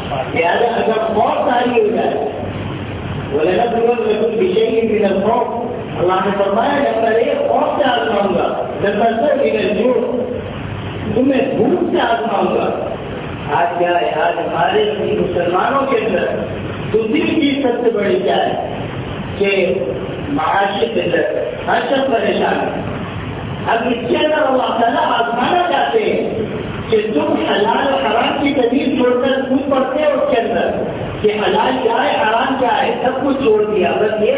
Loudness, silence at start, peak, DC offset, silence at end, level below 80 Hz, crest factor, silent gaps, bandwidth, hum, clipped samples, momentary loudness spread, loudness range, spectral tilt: -16 LUFS; 0 s; -2 dBFS; under 0.1%; 0 s; -42 dBFS; 14 dB; none; 4 kHz; none; under 0.1%; 8 LU; 2 LU; -10 dB/octave